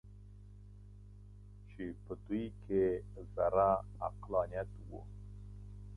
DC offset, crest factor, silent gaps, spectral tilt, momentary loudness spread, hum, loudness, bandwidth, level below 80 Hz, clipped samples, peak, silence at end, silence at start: under 0.1%; 22 dB; none; -9.5 dB/octave; 24 LU; 50 Hz at -50 dBFS; -37 LUFS; 10.5 kHz; -54 dBFS; under 0.1%; -18 dBFS; 0 s; 0.05 s